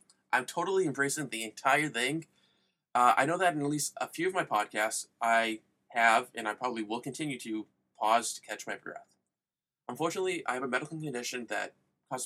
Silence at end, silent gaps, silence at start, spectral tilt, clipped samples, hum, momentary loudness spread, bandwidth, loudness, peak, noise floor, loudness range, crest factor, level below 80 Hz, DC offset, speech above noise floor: 0 s; none; 0.3 s; -3 dB/octave; under 0.1%; none; 13 LU; 16 kHz; -31 LUFS; -10 dBFS; under -90 dBFS; 7 LU; 22 dB; -84 dBFS; under 0.1%; over 59 dB